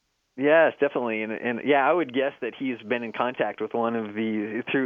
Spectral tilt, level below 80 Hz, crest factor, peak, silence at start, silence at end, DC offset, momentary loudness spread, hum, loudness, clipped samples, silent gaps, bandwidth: -8 dB/octave; -78 dBFS; 18 dB; -6 dBFS; 0.35 s; 0 s; under 0.1%; 9 LU; none; -25 LUFS; under 0.1%; none; 4.5 kHz